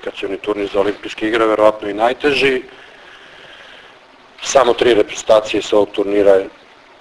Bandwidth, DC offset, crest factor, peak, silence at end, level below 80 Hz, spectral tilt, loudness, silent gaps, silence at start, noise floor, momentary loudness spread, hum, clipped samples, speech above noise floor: 11 kHz; under 0.1%; 16 dB; 0 dBFS; 0.5 s; -48 dBFS; -3.5 dB/octave; -15 LUFS; none; 0 s; -44 dBFS; 10 LU; none; under 0.1%; 29 dB